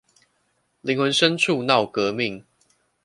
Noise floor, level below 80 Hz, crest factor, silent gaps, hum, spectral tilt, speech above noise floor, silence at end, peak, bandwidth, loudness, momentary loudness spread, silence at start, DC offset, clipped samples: -69 dBFS; -66 dBFS; 22 dB; none; none; -4 dB/octave; 48 dB; 0.65 s; -2 dBFS; 11.5 kHz; -21 LUFS; 10 LU; 0.85 s; under 0.1%; under 0.1%